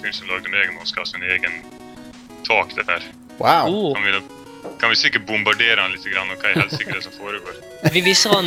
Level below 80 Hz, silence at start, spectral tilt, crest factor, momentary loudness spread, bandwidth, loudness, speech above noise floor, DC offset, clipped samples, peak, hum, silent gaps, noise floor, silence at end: -56 dBFS; 0 s; -3 dB/octave; 20 dB; 17 LU; 16.5 kHz; -18 LUFS; 19 dB; under 0.1%; under 0.1%; 0 dBFS; none; none; -39 dBFS; 0 s